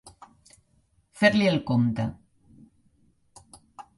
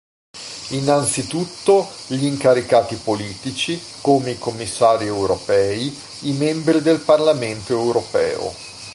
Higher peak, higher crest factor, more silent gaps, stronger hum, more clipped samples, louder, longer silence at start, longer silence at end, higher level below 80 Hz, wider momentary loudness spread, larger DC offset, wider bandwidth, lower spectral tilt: second, -6 dBFS vs -2 dBFS; first, 22 dB vs 16 dB; neither; neither; neither; second, -24 LUFS vs -19 LUFS; second, 0.05 s vs 0.35 s; first, 0.15 s vs 0 s; second, -58 dBFS vs -52 dBFS; about the same, 13 LU vs 11 LU; neither; about the same, 11.5 kHz vs 11.5 kHz; first, -6.5 dB/octave vs -4.5 dB/octave